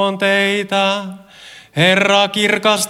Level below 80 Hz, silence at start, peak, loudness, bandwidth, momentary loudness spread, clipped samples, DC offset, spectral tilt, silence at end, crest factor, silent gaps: -62 dBFS; 0 s; 0 dBFS; -14 LUFS; 16.5 kHz; 11 LU; under 0.1%; under 0.1%; -3.5 dB/octave; 0 s; 16 dB; none